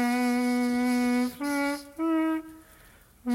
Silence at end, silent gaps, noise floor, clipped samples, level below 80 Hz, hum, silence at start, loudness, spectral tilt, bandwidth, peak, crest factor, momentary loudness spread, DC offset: 0 s; none; -55 dBFS; under 0.1%; -62 dBFS; none; 0 s; -27 LUFS; -3.5 dB/octave; 16 kHz; -18 dBFS; 10 dB; 7 LU; under 0.1%